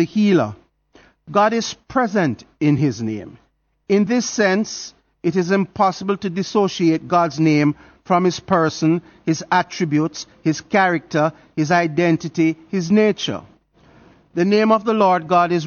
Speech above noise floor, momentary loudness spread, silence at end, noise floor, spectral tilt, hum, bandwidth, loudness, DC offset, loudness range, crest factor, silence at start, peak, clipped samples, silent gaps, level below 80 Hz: 35 dB; 8 LU; 0 s; -53 dBFS; -6 dB/octave; none; 7 kHz; -19 LUFS; under 0.1%; 2 LU; 16 dB; 0 s; -2 dBFS; under 0.1%; none; -58 dBFS